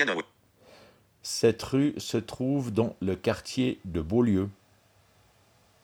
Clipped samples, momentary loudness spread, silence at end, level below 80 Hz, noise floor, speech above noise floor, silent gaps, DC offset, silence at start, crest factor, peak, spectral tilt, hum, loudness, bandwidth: under 0.1%; 9 LU; 1.3 s; -54 dBFS; -63 dBFS; 35 dB; none; under 0.1%; 0 s; 20 dB; -10 dBFS; -5.5 dB/octave; none; -28 LUFS; 18 kHz